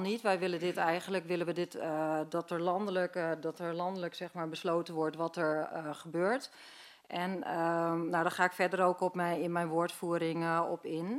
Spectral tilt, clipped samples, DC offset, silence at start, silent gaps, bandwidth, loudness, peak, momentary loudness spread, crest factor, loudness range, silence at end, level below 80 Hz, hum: -5.5 dB/octave; under 0.1%; under 0.1%; 0 s; none; 15.5 kHz; -34 LUFS; -14 dBFS; 8 LU; 20 dB; 4 LU; 0 s; -84 dBFS; none